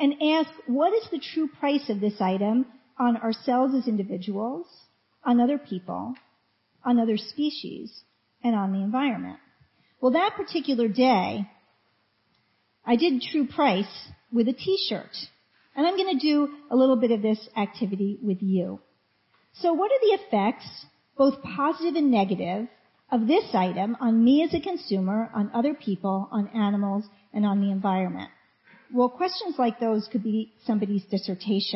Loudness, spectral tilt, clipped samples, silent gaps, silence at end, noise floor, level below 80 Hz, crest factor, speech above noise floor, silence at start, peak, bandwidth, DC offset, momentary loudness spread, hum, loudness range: -25 LUFS; -9 dB/octave; under 0.1%; none; 0 s; -69 dBFS; -66 dBFS; 18 dB; 44 dB; 0 s; -8 dBFS; 6 kHz; under 0.1%; 12 LU; none; 3 LU